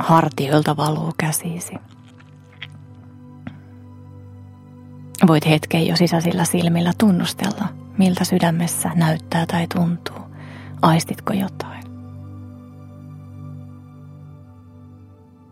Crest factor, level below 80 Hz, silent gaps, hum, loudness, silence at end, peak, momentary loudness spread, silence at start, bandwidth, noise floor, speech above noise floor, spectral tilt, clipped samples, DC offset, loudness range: 22 dB; -60 dBFS; none; none; -19 LUFS; 0.45 s; 0 dBFS; 24 LU; 0 s; 16 kHz; -46 dBFS; 27 dB; -5.5 dB/octave; under 0.1%; under 0.1%; 21 LU